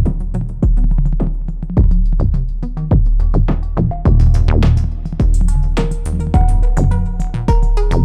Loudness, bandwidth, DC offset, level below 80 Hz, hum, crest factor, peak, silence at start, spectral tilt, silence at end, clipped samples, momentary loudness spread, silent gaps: -17 LUFS; 9.2 kHz; under 0.1%; -14 dBFS; none; 10 dB; -2 dBFS; 0 s; -8.5 dB/octave; 0 s; under 0.1%; 8 LU; none